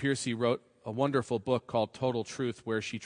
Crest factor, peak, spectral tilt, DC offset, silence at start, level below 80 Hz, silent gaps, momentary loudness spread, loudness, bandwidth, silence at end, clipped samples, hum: 18 dB; -14 dBFS; -5.5 dB/octave; under 0.1%; 0 s; -70 dBFS; none; 5 LU; -32 LUFS; 10.5 kHz; 0 s; under 0.1%; none